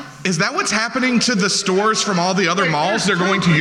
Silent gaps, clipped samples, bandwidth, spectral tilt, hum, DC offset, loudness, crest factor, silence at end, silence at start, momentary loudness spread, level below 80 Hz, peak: none; under 0.1%; 12.5 kHz; -3.5 dB/octave; none; under 0.1%; -17 LUFS; 12 dB; 0 s; 0 s; 2 LU; -56 dBFS; -4 dBFS